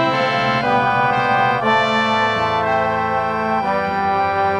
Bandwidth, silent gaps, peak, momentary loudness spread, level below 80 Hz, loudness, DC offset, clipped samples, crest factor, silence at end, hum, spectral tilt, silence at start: 10 kHz; none; -4 dBFS; 4 LU; -50 dBFS; -17 LUFS; under 0.1%; under 0.1%; 12 dB; 0 s; none; -5.5 dB/octave; 0 s